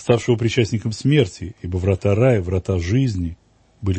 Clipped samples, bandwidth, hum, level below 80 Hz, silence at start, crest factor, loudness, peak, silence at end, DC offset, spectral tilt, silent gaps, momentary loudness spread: under 0.1%; 8.6 kHz; none; -40 dBFS; 0 s; 16 dB; -20 LUFS; -2 dBFS; 0 s; under 0.1%; -7 dB/octave; none; 10 LU